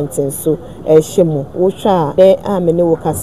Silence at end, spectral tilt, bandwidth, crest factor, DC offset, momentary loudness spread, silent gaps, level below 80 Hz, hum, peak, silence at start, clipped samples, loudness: 0 s; -6.5 dB/octave; 14.5 kHz; 12 dB; 1%; 8 LU; none; -42 dBFS; none; 0 dBFS; 0 s; 0.4%; -13 LUFS